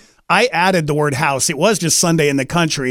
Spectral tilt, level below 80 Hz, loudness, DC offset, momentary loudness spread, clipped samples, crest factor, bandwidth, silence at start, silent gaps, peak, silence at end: -3.5 dB/octave; -48 dBFS; -15 LUFS; under 0.1%; 4 LU; under 0.1%; 16 dB; 18 kHz; 0.3 s; none; 0 dBFS; 0 s